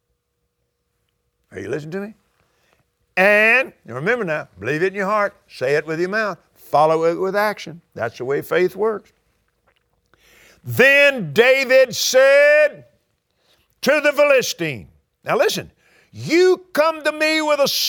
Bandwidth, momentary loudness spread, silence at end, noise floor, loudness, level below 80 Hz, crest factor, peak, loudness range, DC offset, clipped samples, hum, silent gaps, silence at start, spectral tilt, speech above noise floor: over 20 kHz; 16 LU; 0 s; -72 dBFS; -17 LUFS; -64 dBFS; 18 dB; 0 dBFS; 7 LU; under 0.1%; under 0.1%; none; none; 1.55 s; -3.5 dB/octave; 55 dB